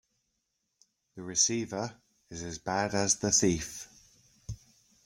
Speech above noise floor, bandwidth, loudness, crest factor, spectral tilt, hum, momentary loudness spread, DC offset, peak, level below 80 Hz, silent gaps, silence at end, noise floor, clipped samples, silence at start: 50 dB; 16.5 kHz; -29 LUFS; 22 dB; -3 dB/octave; none; 21 LU; under 0.1%; -12 dBFS; -58 dBFS; none; 0.5 s; -81 dBFS; under 0.1%; 1.15 s